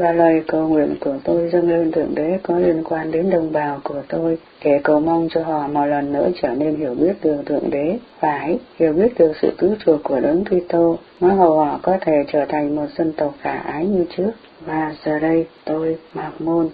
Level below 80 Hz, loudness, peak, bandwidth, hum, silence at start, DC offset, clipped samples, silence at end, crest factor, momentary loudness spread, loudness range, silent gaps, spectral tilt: -50 dBFS; -19 LUFS; 0 dBFS; 5 kHz; none; 0 s; under 0.1%; under 0.1%; 0 s; 18 dB; 8 LU; 4 LU; none; -11.5 dB/octave